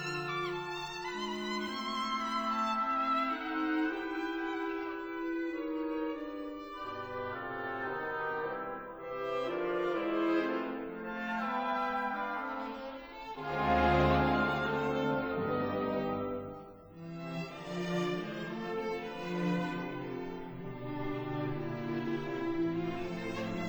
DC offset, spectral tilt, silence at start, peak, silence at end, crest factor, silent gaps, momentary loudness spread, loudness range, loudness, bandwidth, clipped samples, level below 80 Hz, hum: under 0.1%; -6.5 dB/octave; 0 s; -16 dBFS; 0 s; 20 dB; none; 10 LU; 6 LU; -35 LUFS; over 20 kHz; under 0.1%; -54 dBFS; none